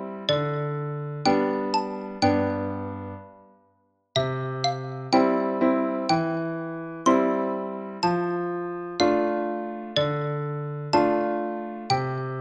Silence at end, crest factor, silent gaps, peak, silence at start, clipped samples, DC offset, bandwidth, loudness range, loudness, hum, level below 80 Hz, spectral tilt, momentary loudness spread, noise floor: 0 s; 18 dB; none; -8 dBFS; 0 s; under 0.1%; under 0.1%; 9.6 kHz; 3 LU; -26 LUFS; none; -62 dBFS; -6 dB/octave; 10 LU; -67 dBFS